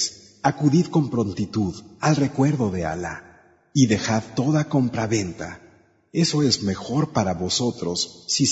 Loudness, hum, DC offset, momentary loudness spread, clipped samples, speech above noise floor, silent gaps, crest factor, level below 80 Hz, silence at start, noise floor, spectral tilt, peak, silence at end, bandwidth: -23 LUFS; none; under 0.1%; 9 LU; under 0.1%; 33 dB; none; 18 dB; -52 dBFS; 0 s; -54 dBFS; -5 dB/octave; -4 dBFS; 0 s; 8 kHz